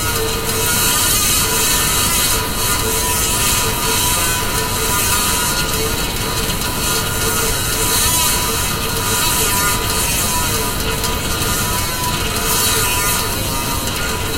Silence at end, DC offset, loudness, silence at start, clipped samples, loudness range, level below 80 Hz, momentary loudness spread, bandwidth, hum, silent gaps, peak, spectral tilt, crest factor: 0 s; under 0.1%; -15 LUFS; 0 s; under 0.1%; 2 LU; -28 dBFS; 5 LU; 16 kHz; none; none; -2 dBFS; -2 dB/octave; 16 dB